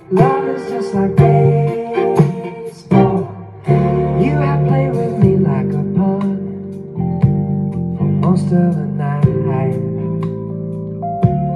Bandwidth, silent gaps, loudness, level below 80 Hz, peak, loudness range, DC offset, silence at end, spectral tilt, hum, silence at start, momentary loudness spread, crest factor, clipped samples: 9.6 kHz; none; -16 LUFS; -40 dBFS; 0 dBFS; 2 LU; under 0.1%; 0 s; -10 dB/octave; none; 0.1 s; 11 LU; 14 dB; under 0.1%